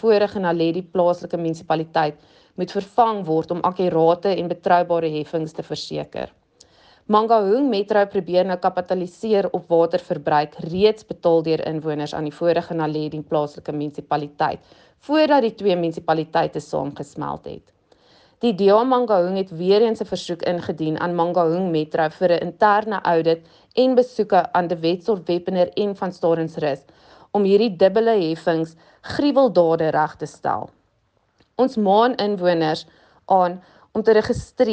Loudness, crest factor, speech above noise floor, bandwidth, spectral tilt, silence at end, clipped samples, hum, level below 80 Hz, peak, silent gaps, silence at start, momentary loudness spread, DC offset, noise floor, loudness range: -20 LUFS; 16 dB; 46 dB; 8.8 kHz; -7 dB/octave; 0 s; under 0.1%; none; -58 dBFS; -4 dBFS; none; 0.05 s; 11 LU; under 0.1%; -65 dBFS; 3 LU